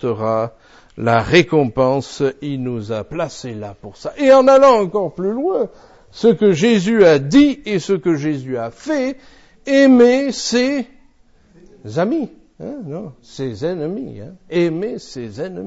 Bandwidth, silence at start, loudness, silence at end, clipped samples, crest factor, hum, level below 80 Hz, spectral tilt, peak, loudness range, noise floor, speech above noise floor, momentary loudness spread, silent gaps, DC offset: 8 kHz; 0 s; -16 LUFS; 0 s; under 0.1%; 16 dB; none; -48 dBFS; -6 dB/octave; 0 dBFS; 10 LU; -51 dBFS; 35 dB; 19 LU; none; under 0.1%